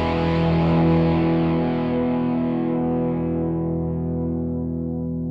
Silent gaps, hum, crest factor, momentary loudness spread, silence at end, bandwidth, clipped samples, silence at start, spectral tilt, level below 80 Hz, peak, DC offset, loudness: none; none; 12 dB; 8 LU; 0 s; 5.4 kHz; under 0.1%; 0 s; -10 dB/octave; -38 dBFS; -8 dBFS; under 0.1%; -22 LUFS